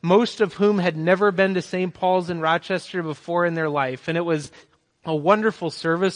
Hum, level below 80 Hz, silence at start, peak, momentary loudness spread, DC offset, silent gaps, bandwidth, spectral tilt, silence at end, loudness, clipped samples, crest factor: none; -66 dBFS; 0.05 s; -4 dBFS; 8 LU; under 0.1%; none; 10.5 kHz; -6 dB/octave; 0 s; -22 LUFS; under 0.1%; 18 dB